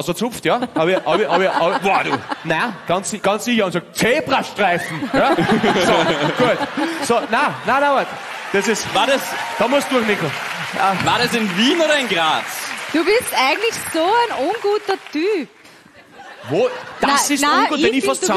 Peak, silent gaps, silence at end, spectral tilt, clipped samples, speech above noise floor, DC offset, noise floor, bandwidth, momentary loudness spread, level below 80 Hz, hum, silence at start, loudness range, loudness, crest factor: -4 dBFS; none; 0 s; -3.5 dB/octave; under 0.1%; 27 dB; under 0.1%; -45 dBFS; 13 kHz; 6 LU; -54 dBFS; none; 0 s; 2 LU; -17 LUFS; 14 dB